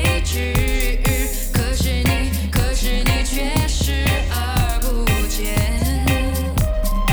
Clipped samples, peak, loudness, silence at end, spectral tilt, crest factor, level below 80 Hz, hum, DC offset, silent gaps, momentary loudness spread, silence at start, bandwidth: under 0.1%; -4 dBFS; -20 LUFS; 0 s; -4.5 dB/octave; 14 dB; -20 dBFS; none; under 0.1%; none; 2 LU; 0 s; over 20 kHz